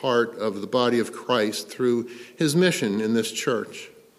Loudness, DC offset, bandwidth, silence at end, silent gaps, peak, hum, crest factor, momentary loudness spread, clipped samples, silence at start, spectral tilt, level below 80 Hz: -24 LUFS; under 0.1%; 15 kHz; 0.3 s; none; -6 dBFS; none; 18 dB; 8 LU; under 0.1%; 0 s; -4.5 dB/octave; -72 dBFS